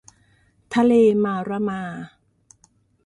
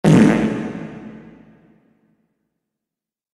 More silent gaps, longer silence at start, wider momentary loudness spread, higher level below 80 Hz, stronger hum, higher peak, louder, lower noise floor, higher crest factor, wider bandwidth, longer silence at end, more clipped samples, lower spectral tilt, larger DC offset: neither; first, 0.7 s vs 0.05 s; second, 19 LU vs 25 LU; second, -62 dBFS vs -48 dBFS; neither; second, -8 dBFS vs 0 dBFS; second, -20 LUFS vs -16 LUFS; second, -61 dBFS vs -87 dBFS; about the same, 16 dB vs 20 dB; second, 10.5 kHz vs 12 kHz; second, 1 s vs 2.25 s; neither; about the same, -7 dB/octave vs -7.5 dB/octave; neither